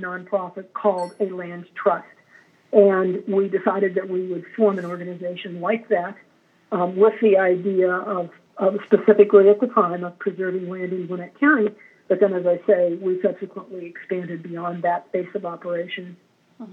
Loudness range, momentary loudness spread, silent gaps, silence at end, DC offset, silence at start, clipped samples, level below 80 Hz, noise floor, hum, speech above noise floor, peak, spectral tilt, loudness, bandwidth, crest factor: 7 LU; 14 LU; none; 0 s; under 0.1%; 0 s; under 0.1%; under -90 dBFS; -54 dBFS; none; 34 dB; -2 dBFS; -8.5 dB/octave; -21 LUFS; 4.6 kHz; 20 dB